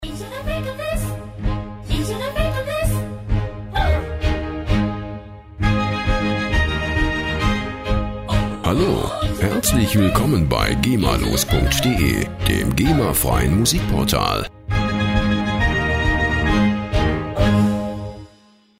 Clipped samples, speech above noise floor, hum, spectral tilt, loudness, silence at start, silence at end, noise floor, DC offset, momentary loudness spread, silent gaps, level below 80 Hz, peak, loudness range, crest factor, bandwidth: under 0.1%; 34 dB; none; -5 dB/octave; -20 LUFS; 0 s; 0.55 s; -52 dBFS; under 0.1%; 9 LU; none; -26 dBFS; 0 dBFS; 5 LU; 18 dB; 16 kHz